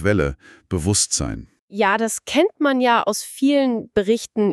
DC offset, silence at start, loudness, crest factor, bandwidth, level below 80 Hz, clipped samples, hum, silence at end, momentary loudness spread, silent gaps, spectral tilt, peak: under 0.1%; 0 s; -20 LUFS; 16 dB; 13.5 kHz; -40 dBFS; under 0.1%; none; 0 s; 8 LU; 1.59-1.68 s; -4 dB/octave; -4 dBFS